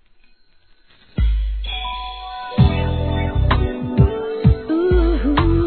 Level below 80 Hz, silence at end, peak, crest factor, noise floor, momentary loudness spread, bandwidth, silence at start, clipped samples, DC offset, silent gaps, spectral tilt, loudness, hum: -22 dBFS; 0 s; -2 dBFS; 16 dB; -53 dBFS; 10 LU; 4.5 kHz; 1.15 s; under 0.1%; 0.2%; none; -11 dB/octave; -19 LUFS; none